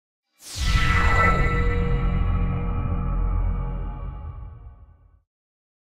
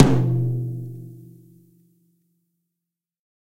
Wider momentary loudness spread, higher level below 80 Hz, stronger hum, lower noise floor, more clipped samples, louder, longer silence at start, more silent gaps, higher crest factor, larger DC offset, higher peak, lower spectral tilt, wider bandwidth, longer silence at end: second, 18 LU vs 23 LU; first, -26 dBFS vs -48 dBFS; neither; second, -51 dBFS vs -85 dBFS; neither; about the same, -24 LUFS vs -23 LUFS; first, 0.4 s vs 0 s; neither; second, 16 dB vs 24 dB; neither; second, -6 dBFS vs 0 dBFS; second, -5.5 dB/octave vs -8.5 dB/octave; first, 12.5 kHz vs 9.4 kHz; second, 1 s vs 2.25 s